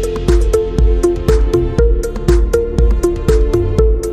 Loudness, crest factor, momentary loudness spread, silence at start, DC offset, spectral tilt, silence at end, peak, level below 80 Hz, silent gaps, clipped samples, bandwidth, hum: -14 LUFS; 12 dB; 2 LU; 0 s; 0.6%; -7.5 dB/octave; 0 s; 0 dBFS; -14 dBFS; none; under 0.1%; 12.5 kHz; none